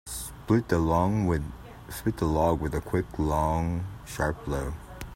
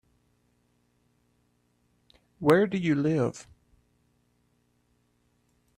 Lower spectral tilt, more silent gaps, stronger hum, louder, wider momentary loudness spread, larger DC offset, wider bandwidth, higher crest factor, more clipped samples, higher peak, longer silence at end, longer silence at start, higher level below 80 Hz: about the same, -7 dB/octave vs -7 dB/octave; neither; second, none vs 60 Hz at -60 dBFS; second, -28 LUFS vs -25 LUFS; first, 13 LU vs 9 LU; neither; first, 16 kHz vs 14 kHz; second, 18 dB vs 24 dB; neither; about the same, -10 dBFS vs -8 dBFS; second, 0 s vs 2.35 s; second, 0.05 s vs 2.4 s; first, -40 dBFS vs -66 dBFS